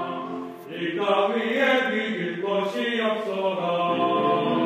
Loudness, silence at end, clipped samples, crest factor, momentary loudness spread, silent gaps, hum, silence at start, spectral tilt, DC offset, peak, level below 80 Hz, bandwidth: -24 LUFS; 0 s; under 0.1%; 16 dB; 10 LU; none; none; 0 s; -5.5 dB/octave; under 0.1%; -8 dBFS; -76 dBFS; 15.5 kHz